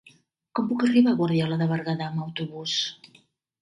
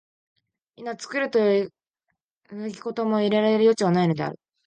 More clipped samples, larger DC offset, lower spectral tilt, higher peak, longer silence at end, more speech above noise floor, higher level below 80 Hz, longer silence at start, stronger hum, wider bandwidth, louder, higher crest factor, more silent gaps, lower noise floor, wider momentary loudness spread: neither; neither; about the same, -6 dB/octave vs -6.5 dB/octave; about the same, -8 dBFS vs -8 dBFS; first, 0.7 s vs 0.3 s; second, 34 dB vs 57 dB; about the same, -68 dBFS vs -72 dBFS; second, 0.55 s vs 0.8 s; neither; first, 10.5 kHz vs 9.4 kHz; about the same, -25 LUFS vs -23 LUFS; about the same, 16 dB vs 16 dB; second, none vs 2.22-2.35 s; second, -58 dBFS vs -79 dBFS; second, 12 LU vs 16 LU